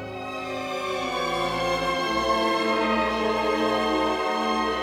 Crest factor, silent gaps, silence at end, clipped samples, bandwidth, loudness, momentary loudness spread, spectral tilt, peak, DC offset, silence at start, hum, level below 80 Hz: 14 dB; none; 0 s; under 0.1%; 18 kHz; -25 LUFS; 7 LU; -4 dB/octave; -12 dBFS; under 0.1%; 0 s; none; -48 dBFS